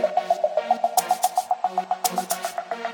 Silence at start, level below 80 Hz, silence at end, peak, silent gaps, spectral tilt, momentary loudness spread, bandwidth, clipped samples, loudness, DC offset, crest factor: 0 s; -74 dBFS; 0 s; -6 dBFS; none; -2 dB/octave; 6 LU; 19 kHz; under 0.1%; -24 LUFS; under 0.1%; 18 dB